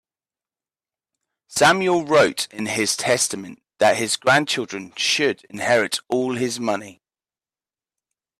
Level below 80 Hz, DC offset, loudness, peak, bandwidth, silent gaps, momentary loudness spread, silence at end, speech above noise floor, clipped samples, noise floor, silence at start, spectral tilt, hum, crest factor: -64 dBFS; under 0.1%; -20 LUFS; -4 dBFS; 15.5 kHz; none; 10 LU; 1.5 s; over 70 dB; under 0.1%; under -90 dBFS; 1.5 s; -2.5 dB/octave; none; 18 dB